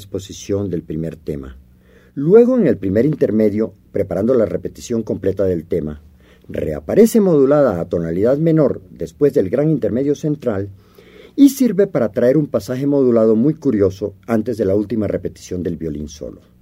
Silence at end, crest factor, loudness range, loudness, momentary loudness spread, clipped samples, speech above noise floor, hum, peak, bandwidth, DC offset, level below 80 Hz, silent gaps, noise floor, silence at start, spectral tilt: 0.3 s; 16 dB; 3 LU; -17 LUFS; 15 LU; under 0.1%; 32 dB; none; 0 dBFS; 16 kHz; under 0.1%; -46 dBFS; none; -48 dBFS; 0 s; -7.5 dB/octave